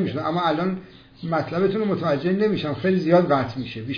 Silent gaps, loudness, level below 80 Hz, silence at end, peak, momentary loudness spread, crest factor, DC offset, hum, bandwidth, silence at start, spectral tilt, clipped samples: none; -22 LUFS; -56 dBFS; 0 s; -6 dBFS; 10 LU; 16 dB; under 0.1%; none; 5.4 kHz; 0 s; -8.5 dB/octave; under 0.1%